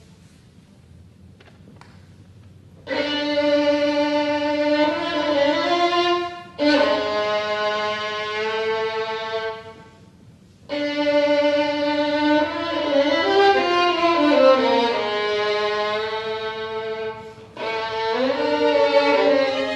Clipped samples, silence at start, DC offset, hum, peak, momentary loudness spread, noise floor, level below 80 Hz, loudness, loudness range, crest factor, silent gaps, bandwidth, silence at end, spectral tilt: under 0.1%; 1.25 s; under 0.1%; none; -4 dBFS; 11 LU; -49 dBFS; -62 dBFS; -20 LUFS; 7 LU; 18 dB; none; 9.2 kHz; 0 s; -4 dB/octave